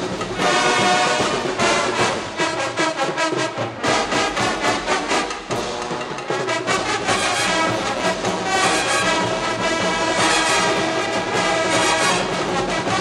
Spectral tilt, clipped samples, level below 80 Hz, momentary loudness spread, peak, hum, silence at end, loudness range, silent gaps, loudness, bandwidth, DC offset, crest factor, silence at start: -2.5 dB/octave; under 0.1%; -48 dBFS; 7 LU; -4 dBFS; none; 0 s; 3 LU; none; -19 LUFS; 16 kHz; under 0.1%; 14 dB; 0 s